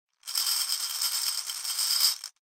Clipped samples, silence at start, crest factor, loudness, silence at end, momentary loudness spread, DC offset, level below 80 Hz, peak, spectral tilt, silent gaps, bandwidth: under 0.1%; 0.25 s; 22 dB; -26 LUFS; 0.15 s; 8 LU; under 0.1%; -78 dBFS; -8 dBFS; 5.5 dB/octave; none; 17 kHz